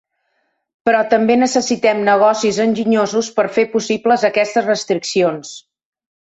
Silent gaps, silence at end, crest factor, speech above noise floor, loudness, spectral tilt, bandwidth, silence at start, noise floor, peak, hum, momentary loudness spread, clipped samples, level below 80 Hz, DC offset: none; 0.8 s; 14 dB; 52 dB; -15 LUFS; -4 dB/octave; 8.2 kHz; 0.85 s; -67 dBFS; -2 dBFS; none; 5 LU; under 0.1%; -60 dBFS; under 0.1%